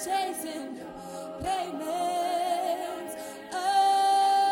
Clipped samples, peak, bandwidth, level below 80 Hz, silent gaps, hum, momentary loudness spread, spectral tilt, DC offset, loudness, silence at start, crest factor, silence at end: under 0.1%; -14 dBFS; 17.5 kHz; -60 dBFS; none; none; 17 LU; -2.5 dB/octave; under 0.1%; -28 LUFS; 0 s; 14 dB; 0 s